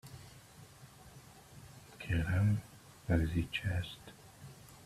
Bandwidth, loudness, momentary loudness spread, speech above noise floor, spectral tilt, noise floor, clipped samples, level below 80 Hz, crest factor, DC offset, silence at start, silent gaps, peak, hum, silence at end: 14.5 kHz; -35 LUFS; 23 LU; 24 dB; -6.5 dB/octave; -57 dBFS; under 0.1%; -52 dBFS; 22 dB; under 0.1%; 0.05 s; none; -16 dBFS; none; 0.05 s